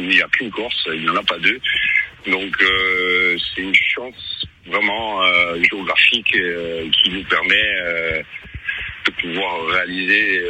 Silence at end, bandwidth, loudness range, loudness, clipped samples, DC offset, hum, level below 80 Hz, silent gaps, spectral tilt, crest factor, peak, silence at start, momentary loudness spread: 0 s; 11 kHz; 3 LU; -16 LUFS; under 0.1%; under 0.1%; none; -48 dBFS; none; -3.5 dB/octave; 18 dB; 0 dBFS; 0 s; 11 LU